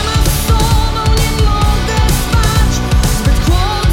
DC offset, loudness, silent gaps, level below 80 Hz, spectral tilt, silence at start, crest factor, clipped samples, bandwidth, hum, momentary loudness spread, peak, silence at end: under 0.1%; -13 LUFS; none; -14 dBFS; -4.5 dB/octave; 0 s; 10 dB; under 0.1%; 17 kHz; none; 1 LU; 0 dBFS; 0 s